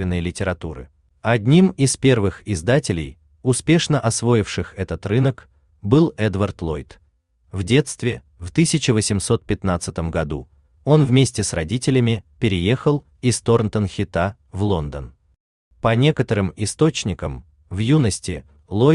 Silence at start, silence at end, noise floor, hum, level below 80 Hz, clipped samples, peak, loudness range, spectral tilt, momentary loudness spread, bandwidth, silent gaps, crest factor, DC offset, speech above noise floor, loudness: 0 s; 0 s; -60 dBFS; none; -42 dBFS; under 0.1%; -4 dBFS; 3 LU; -5.5 dB/octave; 13 LU; 12.5 kHz; 15.40-15.71 s; 16 dB; under 0.1%; 41 dB; -20 LUFS